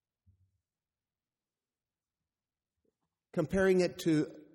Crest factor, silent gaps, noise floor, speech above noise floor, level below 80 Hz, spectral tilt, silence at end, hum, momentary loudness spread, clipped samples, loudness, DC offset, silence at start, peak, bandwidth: 18 dB; none; under -90 dBFS; over 60 dB; -62 dBFS; -6.5 dB/octave; 0.15 s; none; 9 LU; under 0.1%; -31 LUFS; under 0.1%; 3.35 s; -18 dBFS; 14.5 kHz